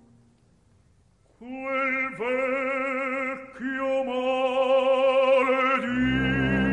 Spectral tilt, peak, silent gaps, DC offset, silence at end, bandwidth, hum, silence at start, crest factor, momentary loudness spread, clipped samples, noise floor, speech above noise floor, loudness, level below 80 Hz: -6.5 dB/octave; -10 dBFS; none; under 0.1%; 0 s; 8.8 kHz; none; 1.4 s; 14 dB; 9 LU; under 0.1%; -61 dBFS; 34 dB; -24 LUFS; -48 dBFS